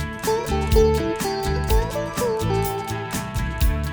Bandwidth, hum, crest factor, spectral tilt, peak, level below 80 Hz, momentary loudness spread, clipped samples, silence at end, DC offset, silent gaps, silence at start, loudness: over 20 kHz; none; 16 dB; -5.5 dB/octave; -6 dBFS; -26 dBFS; 9 LU; under 0.1%; 0 s; under 0.1%; none; 0 s; -23 LUFS